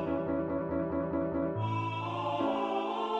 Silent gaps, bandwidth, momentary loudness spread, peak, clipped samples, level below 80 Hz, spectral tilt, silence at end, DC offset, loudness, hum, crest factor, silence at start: none; 8 kHz; 2 LU; -18 dBFS; under 0.1%; -56 dBFS; -8 dB/octave; 0 s; under 0.1%; -33 LUFS; none; 14 dB; 0 s